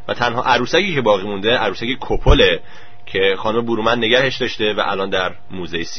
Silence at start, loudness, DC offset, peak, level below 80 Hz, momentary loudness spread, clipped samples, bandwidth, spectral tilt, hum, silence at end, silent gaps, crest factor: 0.1 s; -17 LUFS; 4%; 0 dBFS; -28 dBFS; 10 LU; under 0.1%; 6.6 kHz; -5 dB/octave; none; 0 s; none; 16 dB